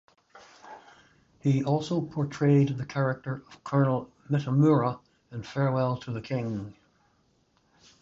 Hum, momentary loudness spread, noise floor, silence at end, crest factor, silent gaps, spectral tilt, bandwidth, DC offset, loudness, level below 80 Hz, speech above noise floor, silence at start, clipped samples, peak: none; 19 LU; -68 dBFS; 1.3 s; 18 dB; none; -8.5 dB/octave; 7.6 kHz; under 0.1%; -28 LUFS; -64 dBFS; 42 dB; 0.35 s; under 0.1%; -10 dBFS